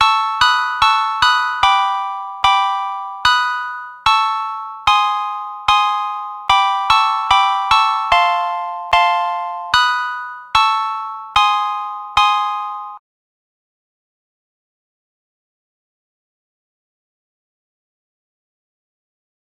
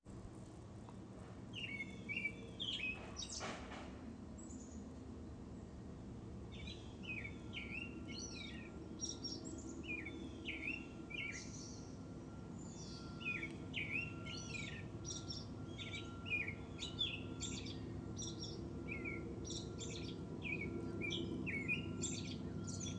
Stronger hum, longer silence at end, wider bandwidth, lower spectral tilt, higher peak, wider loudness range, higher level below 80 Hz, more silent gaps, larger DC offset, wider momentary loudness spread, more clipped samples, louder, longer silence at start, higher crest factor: neither; first, 6.45 s vs 0 s; first, 16 kHz vs 10 kHz; second, 0 dB/octave vs -3.5 dB/octave; first, 0 dBFS vs -28 dBFS; about the same, 5 LU vs 6 LU; first, -48 dBFS vs -60 dBFS; neither; neither; about the same, 10 LU vs 12 LU; neither; first, -16 LUFS vs -46 LUFS; about the same, 0 s vs 0.05 s; about the same, 18 dB vs 18 dB